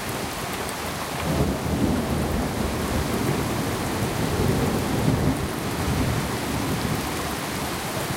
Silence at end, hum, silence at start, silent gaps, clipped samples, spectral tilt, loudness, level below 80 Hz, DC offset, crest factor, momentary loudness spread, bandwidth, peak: 0 s; none; 0 s; none; under 0.1%; -5 dB/octave; -25 LUFS; -36 dBFS; under 0.1%; 18 dB; 5 LU; 17 kHz; -8 dBFS